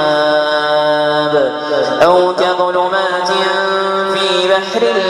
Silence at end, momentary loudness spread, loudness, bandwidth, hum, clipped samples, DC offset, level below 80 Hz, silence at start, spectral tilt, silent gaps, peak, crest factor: 0 s; 4 LU; -13 LUFS; 12 kHz; none; under 0.1%; under 0.1%; -56 dBFS; 0 s; -4 dB/octave; none; 0 dBFS; 12 dB